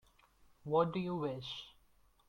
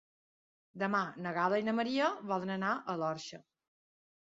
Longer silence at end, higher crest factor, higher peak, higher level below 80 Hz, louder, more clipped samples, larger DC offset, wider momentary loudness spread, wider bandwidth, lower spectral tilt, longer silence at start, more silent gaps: second, 0.6 s vs 0.8 s; about the same, 22 dB vs 18 dB; about the same, -18 dBFS vs -18 dBFS; first, -70 dBFS vs -80 dBFS; second, -37 LUFS vs -34 LUFS; neither; neither; first, 18 LU vs 7 LU; first, 10 kHz vs 7.6 kHz; first, -7.5 dB/octave vs -4 dB/octave; about the same, 0.65 s vs 0.75 s; neither